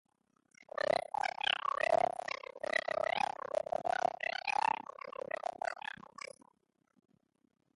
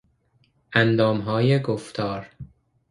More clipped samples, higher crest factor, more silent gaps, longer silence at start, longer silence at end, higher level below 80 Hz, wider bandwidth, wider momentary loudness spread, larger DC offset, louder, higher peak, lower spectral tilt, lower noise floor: neither; about the same, 22 dB vs 22 dB; neither; about the same, 0.6 s vs 0.7 s; first, 1.95 s vs 0.45 s; second, -78 dBFS vs -56 dBFS; about the same, 11.5 kHz vs 11.5 kHz; about the same, 13 LU vs 11 LU; neither; second, -36 LUFS vs -22 LUFS; second, -16 dBFS vs -2 dBFS; second, -2 dB/octave vs -7 dB/octave; first, -76 dBFS vs -64 dBFS